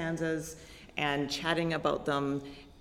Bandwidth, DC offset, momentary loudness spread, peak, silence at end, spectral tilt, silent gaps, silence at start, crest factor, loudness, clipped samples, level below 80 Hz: 16 kHz; under 0.1%; 13 LU; -14 dBFS; 0 s; -5 dB/octave; none; 0 s; 18 dB; -32 LUFS; under 0.1%; -56 dBFS